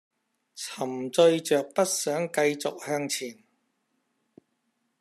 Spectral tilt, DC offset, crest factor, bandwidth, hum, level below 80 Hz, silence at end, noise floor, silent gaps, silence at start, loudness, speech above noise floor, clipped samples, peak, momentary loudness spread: -3.5 dB/octave; under 0.1%; 20 dB; 14 kHz; none; -82 dBFS; 1.65 s; -76 dBFS; none; 0.55 s; -26 LUFS; 50 dB; under 0.1%; -8 dBFS; 12 LU